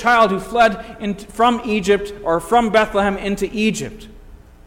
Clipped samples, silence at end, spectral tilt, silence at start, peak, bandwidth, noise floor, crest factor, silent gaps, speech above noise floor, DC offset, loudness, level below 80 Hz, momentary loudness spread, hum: under 0.1%; 0.3 s; -4.5 dB/octave; 0 s; -2 dBFS; 16.5 kHz; -41 dBFS; 16 dB; none; 24 dB; under 0.1%; -18 LUFS; -40 dBFS; 12 LU; none